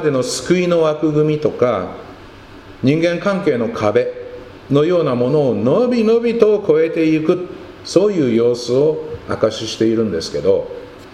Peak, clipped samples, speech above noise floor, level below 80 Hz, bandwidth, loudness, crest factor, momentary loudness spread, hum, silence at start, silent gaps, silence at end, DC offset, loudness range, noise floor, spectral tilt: 0 dBFS; under 0.1%; 23 dB; -50 dBFS; 12 kHz; -16 LUFS; 16 dB; 11 LU; none; 0 s; none; 0 s; under 0.1%; 3 LU; -38 dBFS; -6 dB/octave